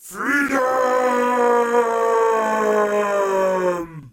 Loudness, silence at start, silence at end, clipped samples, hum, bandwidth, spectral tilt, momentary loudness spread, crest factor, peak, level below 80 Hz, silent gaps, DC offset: -19 LUFS; 0.05 s; 0.05 s; under 0.1%; none; 16.5 kHz; -4.5 dB/octave; 3 LU; 14 dB; -6 dBFS; -60 dBFS; none; under 0.1%